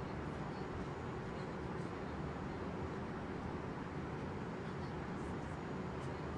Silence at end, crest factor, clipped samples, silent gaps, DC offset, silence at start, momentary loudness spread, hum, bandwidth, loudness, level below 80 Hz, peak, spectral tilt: 0 s; 14 dB; under 0.1%; none; under 0.1%; 0 s; 1 LU; none; 11 kHz; -44 LUFS; -58 dBFS; -30 dBFS; -7 dB/octave